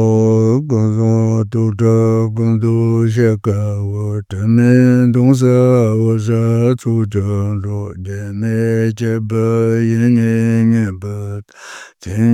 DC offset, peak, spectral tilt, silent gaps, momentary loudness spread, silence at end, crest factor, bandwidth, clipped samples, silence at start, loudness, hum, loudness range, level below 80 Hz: under 0.1%; 0 dBFS; -8.5 dB/octave; none; 13 LU; 0 s; 14 dB; 10.5 kHz; under 0.1%; 0 s; -14 LUFS; none; 4 LU; -54 dBFS